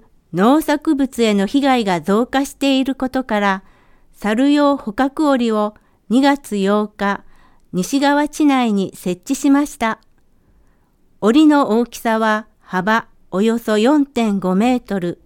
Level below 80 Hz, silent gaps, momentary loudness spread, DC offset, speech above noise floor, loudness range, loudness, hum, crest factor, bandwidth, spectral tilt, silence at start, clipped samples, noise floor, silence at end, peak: -50 dBFS; none; 8 LU; under 0.1%; 38 dB; 2 LU; -17 LUFS; none; 16 dB; 17.5 kHz; -5.5 dB/octave; 0.35 s; under 0.1%; -54 dBFS; 0.1 s; -2 dBFS